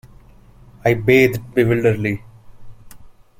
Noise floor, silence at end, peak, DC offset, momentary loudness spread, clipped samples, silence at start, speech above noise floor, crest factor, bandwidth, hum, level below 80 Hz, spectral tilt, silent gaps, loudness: -46 dBFS; 0.3 s; -2 dBFS; under 0.1%; 9 LU; under 0.1%; 0.85 s; 30 dB; 18 dB; 16.5 kHz; none; -46 dBFS; -7 dB/octave; none; -17 LUFS